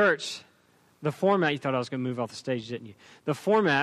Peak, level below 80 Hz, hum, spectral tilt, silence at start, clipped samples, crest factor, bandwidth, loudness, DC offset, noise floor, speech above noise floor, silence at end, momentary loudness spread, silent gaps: -12 dBFS; -72 dBFS; none; -5.5 dB/octave; 0 s; under 0.1%; 16 dB; 14 kHz; -28 LUFS; under 0.1%; -63 dBFS; 36 dB; 0 s; 15 LU; none